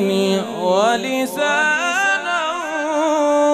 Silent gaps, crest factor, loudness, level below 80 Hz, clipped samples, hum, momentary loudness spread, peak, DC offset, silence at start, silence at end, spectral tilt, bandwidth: none; 14 dB; -18 LUFS; -70 dBFS; under 0.1%; none; 5 LU; -4 dBFS; under 0.1%; 0 s; 0 s; -3.5 dB/octave; 15.5 kHz